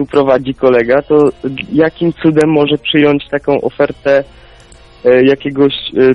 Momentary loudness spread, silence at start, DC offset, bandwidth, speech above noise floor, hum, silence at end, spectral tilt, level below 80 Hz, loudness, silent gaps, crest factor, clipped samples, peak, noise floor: 6 LU; 0 s; under 0.1%; 11.5 kHz; 28 dB; none; 0 s; -7 dB/octave; -42 dBFS; -12 LUFS; none; 12 dB; under 0.1%; 0 dBFS; -39 dBFS